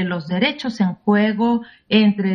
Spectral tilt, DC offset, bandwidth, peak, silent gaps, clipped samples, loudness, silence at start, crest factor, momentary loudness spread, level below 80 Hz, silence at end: -7 dB/octave; under 0.1%; 6.4 kHz; -2 dBFS; none; under 0.1%; -19 LUFS; 0 s; 18 dB; 6 LU; -58 dBFS; 0 s